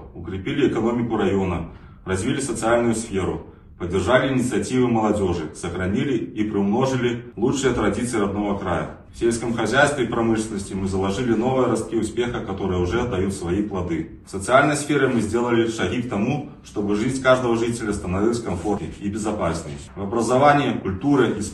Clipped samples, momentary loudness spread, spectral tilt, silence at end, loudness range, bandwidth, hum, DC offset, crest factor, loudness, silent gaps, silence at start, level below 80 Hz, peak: under 0.1%; 9 LU; -5.5 dB/octave; 0 s; 2 LU; 12.5 kHz; none; under 0.1%; 18 dB; -22 LUFS; none; 0 s; -44 dBFS; -2 dBFS